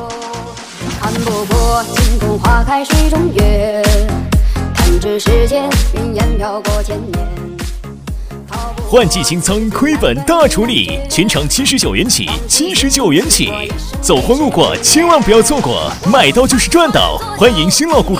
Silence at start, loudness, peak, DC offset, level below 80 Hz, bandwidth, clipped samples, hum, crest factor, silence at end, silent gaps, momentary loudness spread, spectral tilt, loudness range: 0 s; -12 LUFS; 0 dBFS; under 0.1%; -18 dBFS; 16.5 kHz; 0.4%; none; 12 dB; 0 s; none; 14 LU; -4 dB/octave; 6 LU